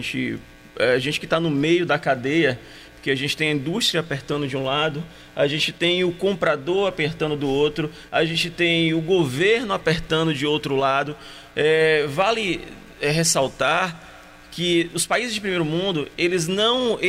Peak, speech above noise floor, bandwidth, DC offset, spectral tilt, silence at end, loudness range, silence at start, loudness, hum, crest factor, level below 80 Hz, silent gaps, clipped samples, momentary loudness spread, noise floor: -6 dBFS; 22 dB; 16 kHz; under 0.1%; -4 dB/octave; 0 s; 2 LU; 0 s; -21 LUFS; none; 14 dB; -50 dBFS; none; under 0.1%; 8 LU; -43 dBFS